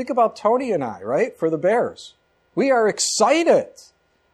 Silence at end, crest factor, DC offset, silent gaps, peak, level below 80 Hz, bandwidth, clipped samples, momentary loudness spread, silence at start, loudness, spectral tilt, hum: 0.7 s; 16 dB; under 0.1%; none; -4 dBFS; -68 dBFS; 13.5 kHz; under 0.1%; 8 LU; 0 s; -20 LUFS; -3.5 dB/octave; none